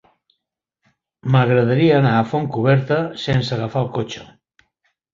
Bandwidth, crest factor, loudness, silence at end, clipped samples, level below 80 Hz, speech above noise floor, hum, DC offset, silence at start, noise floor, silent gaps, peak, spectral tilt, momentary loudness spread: 7.4 kHz; 16 dB; -18 LUFS; 0.9 s; under 0.1%; -52 dBFS; 62 dB; none; under 0.1%; 1.25 s; -79 dBFS; none; -2 dBFS; -7.5 dB/octave; 11 LU